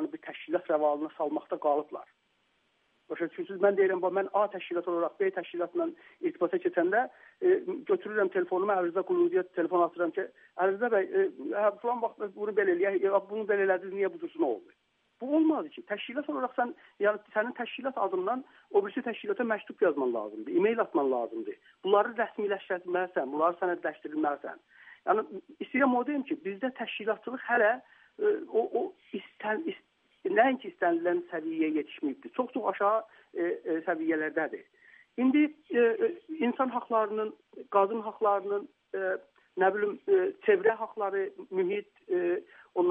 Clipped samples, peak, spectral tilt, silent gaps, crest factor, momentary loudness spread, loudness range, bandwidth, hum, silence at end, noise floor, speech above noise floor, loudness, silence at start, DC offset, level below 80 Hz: under 0.1%; -10 dBFS; -8.5 dB/octave; none; 20 dB; 10 LU; 3 LU; 3.8 kHz; none; 0 s; -73 dBFS; 43 dB; -30 LUFS; 0 s; under 0.1%; -88 dBFS